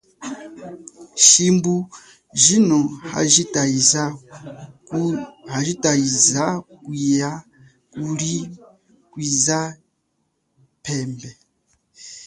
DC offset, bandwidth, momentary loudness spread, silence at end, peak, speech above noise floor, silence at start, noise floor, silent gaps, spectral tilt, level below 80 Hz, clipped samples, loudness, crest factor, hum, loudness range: under 0.1%; 14.5 kHz; 23 LU; 0 s; 0 dBFS; 51 dB; 0.2 s; -71 dBFS; none; -3 dB/octave; -60 dBFS; under 0.1%; -17 LUFS; 22 dB; none; 9 LU